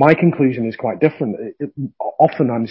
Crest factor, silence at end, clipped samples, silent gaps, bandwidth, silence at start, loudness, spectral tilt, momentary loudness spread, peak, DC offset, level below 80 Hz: 16 dB; 0 s; under 0.1%; none; 5.8 kHz; 0 s; -18 LUFS; -10.5 dB/octave; 13 LU; 0 dBFS; under 0.1%; -60 dBFS